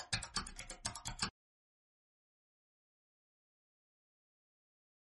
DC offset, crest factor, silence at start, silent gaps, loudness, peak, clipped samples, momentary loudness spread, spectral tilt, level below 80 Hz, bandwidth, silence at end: under 0.1%; 30 dB; 0 s; none; -43 LUFS; -20 dBFS; under 0.1%; 5 LU; -1.5 dB/octave; -62 dBFS; 11.5 kHz; 3.85 s